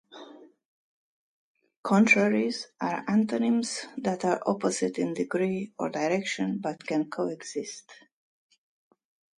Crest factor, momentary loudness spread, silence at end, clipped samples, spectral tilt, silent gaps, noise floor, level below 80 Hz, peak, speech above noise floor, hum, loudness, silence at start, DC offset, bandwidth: 22 dB; 14 LU; 1.45 s; under 0.1%; -5 dB/octave; 0.65-1.55 s, 1.76-1.84 s; -50 dBFS; -74 dBFS; -8 dBFS; 22 dB; none; -27 LUFS; 0.1 s; under 0.1%; 11.5 kHz